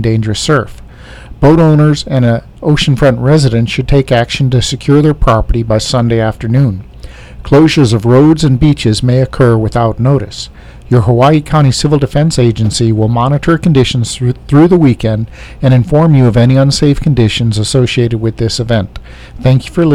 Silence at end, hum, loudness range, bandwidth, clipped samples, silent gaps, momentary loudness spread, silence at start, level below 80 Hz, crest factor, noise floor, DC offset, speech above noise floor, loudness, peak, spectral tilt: 0 s; none; 2 LU; 12 kHz; under 0.1%; none; 7 LU; 0 s; -26 dBFS; 10 dB; -30 dBFS; 0.3%; 21 dB; -10 LUFS; 0 dBFS; -6.5 dB/octave